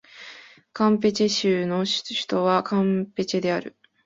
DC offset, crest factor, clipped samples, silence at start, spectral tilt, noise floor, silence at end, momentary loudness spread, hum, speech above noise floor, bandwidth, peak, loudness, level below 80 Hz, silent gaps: under 0.1%; 16 dB; under 0.1%; 0.15 s; -5 dB/octave; -46 dBFS; 0.35 s; 20 LU; none; 24 dB; 8 kHz; -8 dBFS; -23 LUFS; -64 dBFS; none